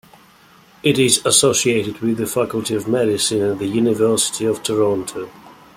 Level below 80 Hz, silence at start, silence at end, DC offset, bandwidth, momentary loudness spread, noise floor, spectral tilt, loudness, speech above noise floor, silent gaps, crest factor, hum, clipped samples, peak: -56 dBFS; 0.85 s; 0.25 s; under 0.1%; 16.5 kHz; 9 LU; -49 dBFS; -3.5 dB/octave; -17 LUFS; 31 dB; none; 18 dB; none; under 0.1%; 0 dBFS